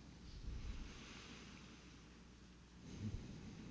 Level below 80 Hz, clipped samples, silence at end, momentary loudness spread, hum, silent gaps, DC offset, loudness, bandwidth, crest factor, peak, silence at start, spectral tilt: -56 dBFS; under 0.1%; 0 s; 12 LU; none; none; under 0.1%; -55 LUFS; 8 kHz; 18 dB; -36 dBFS; 0 s; -5 dB/octave